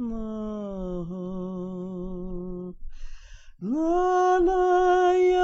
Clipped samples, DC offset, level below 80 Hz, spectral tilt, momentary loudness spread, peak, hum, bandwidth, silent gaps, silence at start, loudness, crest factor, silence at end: under 0.1%; under 0.1%; -42 dBFS; -5.5 dB/octave; 15 LU; -10 dBFS; none; 7.6 kHz; none; 0 s; -25 LUFS; 14 dB; 0 s